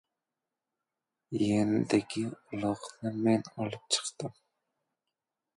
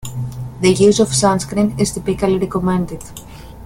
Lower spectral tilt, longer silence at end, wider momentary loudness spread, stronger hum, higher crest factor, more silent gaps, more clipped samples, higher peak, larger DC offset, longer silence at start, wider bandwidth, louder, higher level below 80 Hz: about the same, -5 dB/octave vs -5 dB/octave; first, 1.25 s vs 0 s; second, 11 LU vs 15 LU; neither; first, 22 dB vs 16 dB; neither; neither; second, -10 dBFS vs 0 dBFS; neither; first, 1.3 s vs 0 s; second, 11.5 kHz vs 16.5 kHz; second, -31 LUFS vs -16 LUFS; second, -68 dBFS vs -38 dBFS